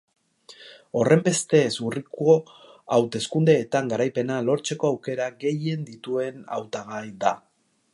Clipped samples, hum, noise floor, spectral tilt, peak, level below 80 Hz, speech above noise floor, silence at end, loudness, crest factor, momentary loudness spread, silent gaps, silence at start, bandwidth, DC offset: under 0.1%; none; -50 dBFS; -5.5 dB/octave; -4 dBFS; -68 dBFS; 27 dB; 0.55 s; -24 LUFS; 20 dB; 12 LU; none; 0.5 s; 11.5 kHz; under 0.1%